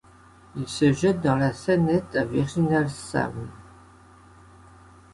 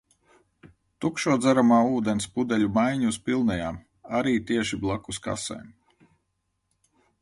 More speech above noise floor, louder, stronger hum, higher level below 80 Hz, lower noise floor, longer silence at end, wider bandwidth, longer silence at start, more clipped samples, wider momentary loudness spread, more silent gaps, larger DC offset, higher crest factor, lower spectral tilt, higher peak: second, 28 dB vs 52 dB; about the same, -24 LUFS vs -25 LUFS; neither; about the same, -52 dBFS vs -54 dBFS; second, -52 dBFS vs -76 dBFS; about the same, 1.5 s vs 1.55 s; about the same, 11.5 kHz vs 11.5 kHz; about the same, 0.55 s vs 0.65 s; neither; about the same, 14 LU vs 12 LU; neither; neither; about the same, 18 dB vs 18 dB; first, -6.5 dB/octave vs -5 dB/octave; about the same, -8 dBFS vs -8 dBFS